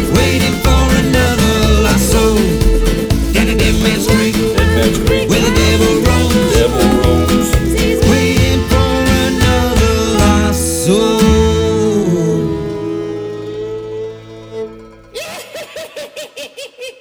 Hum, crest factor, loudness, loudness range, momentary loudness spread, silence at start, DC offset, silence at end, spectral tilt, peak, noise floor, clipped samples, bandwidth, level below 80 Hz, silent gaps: none; 12 dB; -12 LUFS; 12 LU; 16 LU; 0 s; under 0.1%; 0.1 s; -5 dB/octave; 0 dBFS; -34 dBFS; under 0.1%; over 20 kHz; -20 dBFS; none